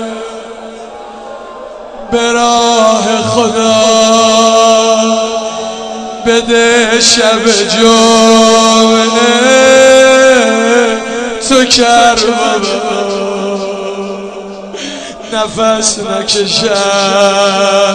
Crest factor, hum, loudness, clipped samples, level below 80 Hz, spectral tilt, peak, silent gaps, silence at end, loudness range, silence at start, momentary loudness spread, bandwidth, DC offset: 10 dB; none; -8 LUFS; 2%; -44 dBFS; -2.5 dB/octave; 0 dBFS; none; 0 s; 8 LU; 0 s; 19 LU; 12 kHz; under 0.1%